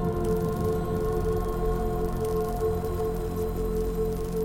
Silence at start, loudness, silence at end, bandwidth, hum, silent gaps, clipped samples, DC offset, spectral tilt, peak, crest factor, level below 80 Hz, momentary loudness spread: 0 s; -29 LUFS; 0 s; 17 kHz; none; none; under 0.1%; under 0.1%; -7.5 dB/octave; -14 dBFS; 12 dB; -34 dBFS; 2 LU